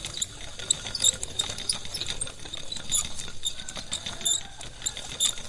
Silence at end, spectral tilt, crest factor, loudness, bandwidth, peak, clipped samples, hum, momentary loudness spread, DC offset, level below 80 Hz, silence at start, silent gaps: 0 s; 0 dB/octave; 24 dB; -28 LUFS; 11.5 kHz; -6 dBFS; under 0.1%; none; 12 LU; under 0.1%; -46 dBFS; 0 s; none